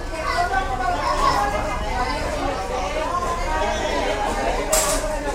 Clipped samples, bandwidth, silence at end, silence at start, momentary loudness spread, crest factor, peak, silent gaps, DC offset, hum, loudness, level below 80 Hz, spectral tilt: under 0.1%; 16 kHz; 0 s; 0 s; 6 LU; 18 dB; -4 dBFS; none; under 0.1%; none; -22 LUFS; -30 dBFS; -3 dB/octave